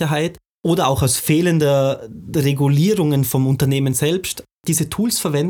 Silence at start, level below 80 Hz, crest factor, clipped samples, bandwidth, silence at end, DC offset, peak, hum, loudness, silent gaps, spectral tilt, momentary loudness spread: 0 s; -46 dBFS; 14 dB; under 0.1%; 19 kHz; 0 s; under 0.1%; -4 dBFS; none; -18 LUFS; 0.50-0.62 s, 4.53-4.57 s; -5.5 dB/octave; 9 LU